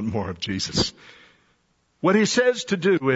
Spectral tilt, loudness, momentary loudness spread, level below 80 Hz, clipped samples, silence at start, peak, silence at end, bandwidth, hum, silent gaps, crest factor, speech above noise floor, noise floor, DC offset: -4.5 dB/octave; -22 LUFS; 9 LU; -52 dBFS; under 0.1%; 0 s; -6 dBFS; 0 s; 8 kHz; none; none; 18 dB; 45 dB; -67 dBFS; under 0.1%